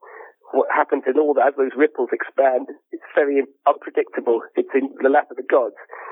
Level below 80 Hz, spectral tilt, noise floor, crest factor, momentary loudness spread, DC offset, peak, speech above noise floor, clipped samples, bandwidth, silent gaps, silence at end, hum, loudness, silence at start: under -90 dBFS; -8.5 dB/octave; -43 dBFS; 16 dB; 6 LU; under 0.1%; -4 dBFS; 23 dB; under 0.1%; 3.8 kHz; none; 0 s; none; -20 LUFS; 0.05 s